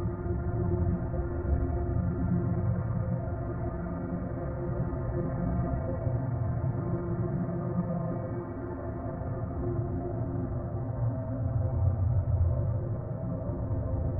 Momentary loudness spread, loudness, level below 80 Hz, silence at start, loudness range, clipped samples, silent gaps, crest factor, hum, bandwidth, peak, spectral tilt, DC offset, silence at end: 6 LU; -32 LUFS; -38 dBFS; 0 s; 3 LU; under 0.1%; none; 14 dB; none; 2.4 kHz; -16 dBFS; -14.5 dB/octave; under 0.1%; 0 s